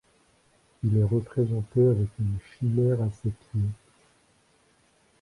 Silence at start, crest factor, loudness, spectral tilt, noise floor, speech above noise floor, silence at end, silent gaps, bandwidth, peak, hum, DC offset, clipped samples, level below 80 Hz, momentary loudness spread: 0.85 s; 16 dB; -27 LUFS; -10.5 dB/octave; -64 dBFS; 39 dB; 1.5 s; none; 11 kHz; -12 dBFS; none; under 0.1%; under 0.1%; -50 dBFS; 9 LU